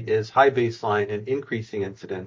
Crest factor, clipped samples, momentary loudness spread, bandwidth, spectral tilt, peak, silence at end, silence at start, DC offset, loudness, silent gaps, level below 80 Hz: 20 dB; under 0.1%; 12 LU; 7.4 kHz; -6.5 dB/octave; -4 dBFS; 0 s; 0 s; under 0.1%; -24 LUFS; none; -58 dBFS